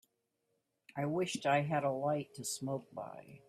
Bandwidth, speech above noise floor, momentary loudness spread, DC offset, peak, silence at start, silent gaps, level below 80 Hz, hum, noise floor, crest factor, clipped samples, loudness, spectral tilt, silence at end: 15 kHz; 46 dB; 15 LU; under 0.1%; -20 dBFS; 0.95 s; none; -78 dBFS; none; -83 dBFS; 18 dB; under 0.1%; -36 LUFS; -5 dB/octave; 0.1 s